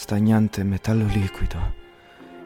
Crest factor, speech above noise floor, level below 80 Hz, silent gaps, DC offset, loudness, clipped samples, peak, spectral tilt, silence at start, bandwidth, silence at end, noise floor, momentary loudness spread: 16 dB; 25 dB; -32 dBFS; none; under 0.1%; -23 LUFS; under 0.1%; -8 dBFS; -7.5 dB/octave; 0 s; 16 kHz; 0 s; -46 dBFS; 12 LU